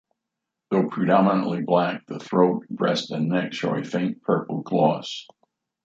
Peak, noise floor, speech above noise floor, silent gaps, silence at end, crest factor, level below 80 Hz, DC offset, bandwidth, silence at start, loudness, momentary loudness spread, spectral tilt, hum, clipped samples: -4 dBFS; -84 dBFS; 61 dB; none; 0.6 s; 20 dB; -70 dBFS; under 0.1%; 7.8 kHz; 0.7 s; -23 LUFS; 7 LU; -7 dB/octave; none; under 0.1%